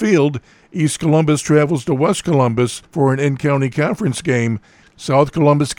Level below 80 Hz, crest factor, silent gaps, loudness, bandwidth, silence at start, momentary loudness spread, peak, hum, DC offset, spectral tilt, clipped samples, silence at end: -50 dBFS; 16 dB; none; -16 LUFS; 16 kHz; 0 s; 6 LU; 0 dBFS; none; under 0.1%; -6 dB/octave; under 0.1%; 0.05 s